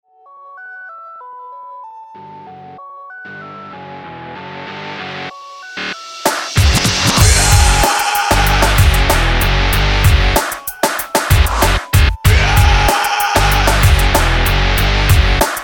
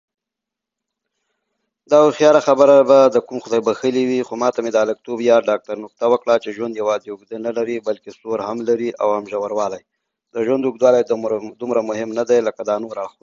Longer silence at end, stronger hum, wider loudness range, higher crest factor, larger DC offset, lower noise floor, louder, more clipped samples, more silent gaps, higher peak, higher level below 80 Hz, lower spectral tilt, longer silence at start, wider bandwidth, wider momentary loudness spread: second, 0 s vs 0.15 s; neither; first, 20 LU vs 7 LU; about the same, 14 dB vs 18 dB; neither; second, -40 dBFS vs -85 dBFS; first, -13 LUFS vs -18 LUFS; neither; neither; about the same, 0 dBFS vs 0 dBFS; first, -18 dBFS vs -66 dBFS; second, -3.5 dB/octave vs -5 dB/octave; second, 0.45 s vs 1.9 s; first, 20 kHz vs 7.6 kHz; first, 22 LU vs 13 LU